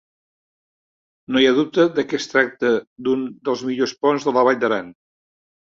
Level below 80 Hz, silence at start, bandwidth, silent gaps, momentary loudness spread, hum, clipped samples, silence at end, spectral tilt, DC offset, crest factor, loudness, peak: -64 dBFS; 1.3 s; 7.6 kHz; 2.87-2.96 s; 7 LU; none; under 0.1%; 0.75 s; -4.5 dB/octave; under 0.1%; 18 dB; -19 LUFS; -2 dBFS